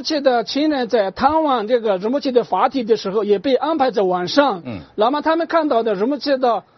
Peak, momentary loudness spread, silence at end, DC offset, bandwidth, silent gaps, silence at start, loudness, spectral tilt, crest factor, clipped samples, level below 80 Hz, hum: -2 dBFS; 3 LU; 0.15 s; under 0.1%; 6.6 kHz; none; 0 s; -18 LUFS; -3 dB/octave; 16 dB; under 0.1%; -56 dBFS; none